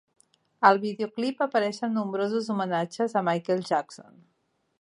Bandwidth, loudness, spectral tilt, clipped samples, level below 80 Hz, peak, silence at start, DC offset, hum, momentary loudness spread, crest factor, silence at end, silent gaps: 11 kHz; -26 LUFS; -6 dB/octave; under 0.1%; -78 dBFS; -4 dBFS; 0.6 s; under 0.1%; none; 8 LU; 24 dB; 0.8 s; none